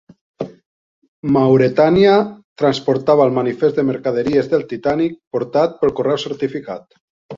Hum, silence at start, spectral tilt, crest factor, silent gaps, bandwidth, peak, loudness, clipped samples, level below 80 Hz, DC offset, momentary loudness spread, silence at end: none; 0.4 s; -7.5 dB/octave; 16 dB; 0.66-1.02 s, 1.08-1.23 s, 2.44-2.56 s, 5.27-5.31 s, 7.00-7.29 s; 7.4 kHz; 0 dBFS; -16 LUFS; under 0.1%; -52 dBFS; under 0.1%; 15 LU; 0 s